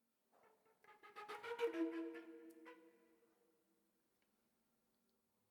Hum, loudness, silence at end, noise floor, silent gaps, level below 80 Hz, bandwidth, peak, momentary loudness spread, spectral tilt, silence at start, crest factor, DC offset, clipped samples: none; -47 LUFS; 2.55 s; -84 dBFS; none; under -90 dBFS; 19 kHz; -30 dBFS; 20 LU; -4 dB/octave; 0.45 s; 22 dB; under 0.1%; under 0.1%